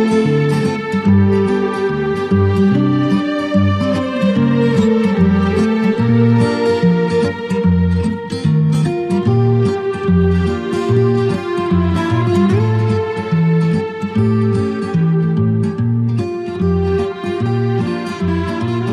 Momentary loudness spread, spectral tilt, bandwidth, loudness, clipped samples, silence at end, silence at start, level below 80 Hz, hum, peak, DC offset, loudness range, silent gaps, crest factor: 5 LU; -8.5 dB/octave; 10.5 kHz; -15 LUFS; under 0.1%; 0 s; 0 s; -38 dBFS; none; -2 dBFS; under 0.1%; 3 LU; none; 12 dB